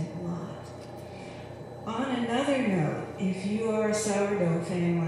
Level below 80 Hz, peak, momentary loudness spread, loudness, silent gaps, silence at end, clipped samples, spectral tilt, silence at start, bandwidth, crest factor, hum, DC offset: -62 dBFS; -14 dBFS; 15 LU; -29 LUFS; none; 0 s; under 0.1%; -6 dB/octave; 0 s; 13 kHz; 14 dB; none; under 0.1%